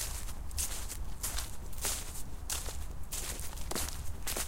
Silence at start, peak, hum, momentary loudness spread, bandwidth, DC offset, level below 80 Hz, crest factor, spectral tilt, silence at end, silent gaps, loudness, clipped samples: 0 s; -16 dBFS; none; 7 LU; 17 kHz; under 0.1%; -42 dBFS; 20 dB; -2 dB/octave; 0 s; none; -38 LUFS; under 0.1%